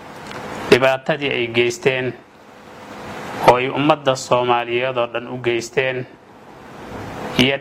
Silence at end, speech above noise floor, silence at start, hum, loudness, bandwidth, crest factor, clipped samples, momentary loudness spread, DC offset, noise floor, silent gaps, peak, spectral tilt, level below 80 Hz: 0 s; 24 dB; 0 s; none; -18 LUFS; 16 kHz; 20 dB; under 0.1%; 20 LU; under 0.1%; -42 dBFS; none; 0 dBFS; -4.5 dB/octave; -52 dBFS